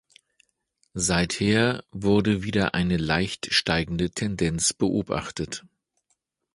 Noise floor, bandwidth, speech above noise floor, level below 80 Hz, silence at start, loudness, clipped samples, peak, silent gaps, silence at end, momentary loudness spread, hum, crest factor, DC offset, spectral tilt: -74 dBFS; 11.5 kHz; 50 dB; -46 dBFS; 0.95 s; -24 LUFS; under 0.1%; -6 dBFS; none; 0.95 s; 8 LU; none; 20 dB; under 0.1%; -4 dB/octave